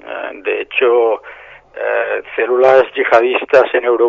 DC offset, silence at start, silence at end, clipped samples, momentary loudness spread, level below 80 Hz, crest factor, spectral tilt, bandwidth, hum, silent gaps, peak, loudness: under 0.1%; 0.05 s; 0 s; 0.1%; 12 LU; -58 dBFS; 14 dB; -5 dB/octave; 7.2 kHz; none; none; 0 dBFS; -14 LUFS